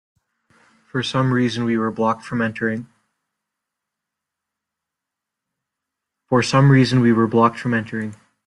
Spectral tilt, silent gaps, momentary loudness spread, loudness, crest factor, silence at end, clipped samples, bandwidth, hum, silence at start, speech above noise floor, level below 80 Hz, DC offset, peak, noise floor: -6.5 dB/octave; none; 14 LU; -19 LUFS; 18 dB; 0.3 s; under 0.1%; 11 kHz; none; 0.95 s; 66 dB; -58 dBFS; under 0.1%; -2 dBFS; -84 dBFS